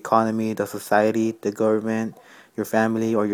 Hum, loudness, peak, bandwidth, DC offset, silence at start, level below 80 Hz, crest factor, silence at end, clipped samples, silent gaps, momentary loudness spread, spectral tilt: none; -23 LUFS; -2 dBFS; 19.5 kHz; under 0.1%; 0.05 s; -66 dBFS; 20 dB; 0 s; under 0.1%; none; 9 LU; -6 dB/octave